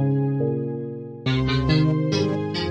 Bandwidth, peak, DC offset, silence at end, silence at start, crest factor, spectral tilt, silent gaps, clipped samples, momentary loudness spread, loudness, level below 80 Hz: 8 kHz; -8 dBFS; under 0.1%; 0 s; 0 s; 14 dB; -7.5 dB/octave; none; under 0.1%; 10 LU; -23 LUFS; -42 dBFS